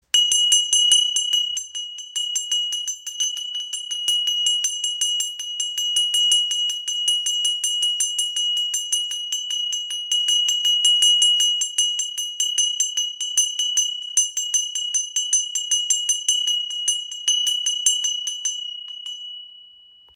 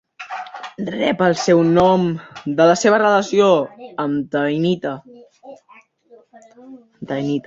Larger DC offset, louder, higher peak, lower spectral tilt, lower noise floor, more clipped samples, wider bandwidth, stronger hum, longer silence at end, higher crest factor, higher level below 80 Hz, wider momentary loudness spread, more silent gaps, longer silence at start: neither; about the same, -19 LUFS vs -17 LUFS; about the same, -4 dBFS vs -2 dBFS; second, 7 dB/octave vs -5.5 dB/octave; about the same, -50 dBFS vs -51 dBFS; neither; first, 17 kHz vs 7.8 kHz; neither; first, 0.5 s vs 0.05 s; about the same, 20 dB vs 16 dB; second, -78 dBFS vs -56 dBFS; second, 10 LU vs 16 LU; neither; about the same, 0.15 s vs 0.2 s